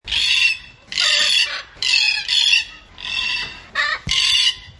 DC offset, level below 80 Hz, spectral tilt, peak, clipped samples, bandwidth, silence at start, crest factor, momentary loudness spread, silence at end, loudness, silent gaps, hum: under 0.1%; -46 dBFS; 1 dB/octave; -2 dBFS; under 0.1%; 11.5 kHz; 0.05 s; 18 dB; 11 LU; 0.1 s; -16 LUFS; none; none